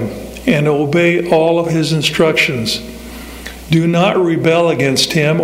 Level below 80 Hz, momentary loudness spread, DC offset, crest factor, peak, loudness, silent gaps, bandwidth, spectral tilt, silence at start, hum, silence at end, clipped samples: -40 dBFS; 17 LU; under 0.1%; 12 dB; 0 dBFS; -13 LUFS; none; 16 kHz; -5 dB/octave; 0 s; none; 0 s; under 0.1%